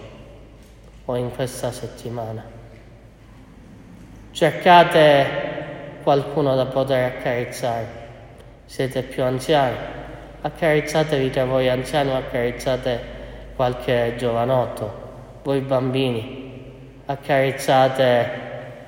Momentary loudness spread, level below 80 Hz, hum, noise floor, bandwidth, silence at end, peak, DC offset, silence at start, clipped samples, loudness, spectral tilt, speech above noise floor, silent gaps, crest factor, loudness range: 19 LU; -46 dBFS; none; -45 dBFS; 16.5 kHz; 0 s; 0 dBFS; under 0.1%; 0 s; under 0.1%; -20 LUFS; -5.5 dB/octave; 25 dB; none; 22 dB; 11 LU